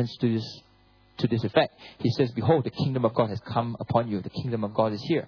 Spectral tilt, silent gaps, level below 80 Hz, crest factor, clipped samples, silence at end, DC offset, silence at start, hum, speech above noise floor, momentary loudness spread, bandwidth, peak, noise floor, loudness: -8 dB/octave; none; -60 dBFS; 20 dB; under 0.1%; 0 s; under 0.1%; 0 s; none; 33 dB; 7 LU; 5.4 kHz; -8 dBFS; -59 dBFS; -27 LUFS